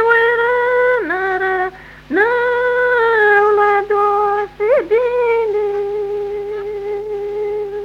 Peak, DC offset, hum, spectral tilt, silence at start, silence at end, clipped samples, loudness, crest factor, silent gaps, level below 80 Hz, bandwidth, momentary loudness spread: -2 dBFS; under 0.1%; none; -5.5 dB/octave; 0 s; 0 s; under 0.1%; -16 LUFS; 12 dB; none; -48 dBFS; 6.6 kHz; 11 LU